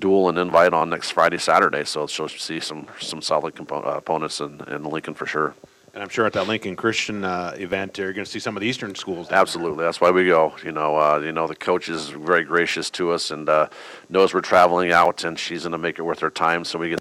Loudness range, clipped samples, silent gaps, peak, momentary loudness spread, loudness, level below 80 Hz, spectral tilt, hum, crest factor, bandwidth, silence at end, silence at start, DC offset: 6 LU; under 0.1%; none; -4 dBFS; 12 LU; -21 LUFS; -62 dBFS; -4 dB/octave; none; 18 dB; 15 kHz; 0 s; 0 s; under 0.1%